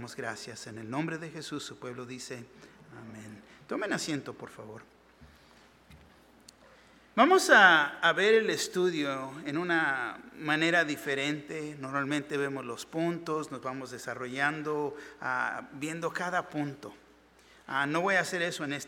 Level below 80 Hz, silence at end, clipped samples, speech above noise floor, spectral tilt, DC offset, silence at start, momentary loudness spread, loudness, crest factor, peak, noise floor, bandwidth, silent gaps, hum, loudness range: -70 dBFS; 0 s; under 0.1%; 29 dB; -3.5 dB/octave; under 0.1%; 0 s; 19 LU; -29 LUFS; 26 dB; -6 dBFS; -60 dBFS; 17 kHz; none; none; 15 LU